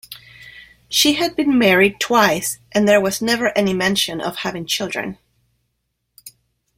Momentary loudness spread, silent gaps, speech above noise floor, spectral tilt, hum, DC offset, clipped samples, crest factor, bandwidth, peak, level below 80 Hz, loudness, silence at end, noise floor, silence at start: 11 LU; none; 55 dB; -3 dB/octave; none; under 0.1%; under 0.1%; 18 dB; 16.5 kHz; -2 dBFS; -52 dBFS; -17 LUFS; 0.5 s; -73 dBFS; 0.1 s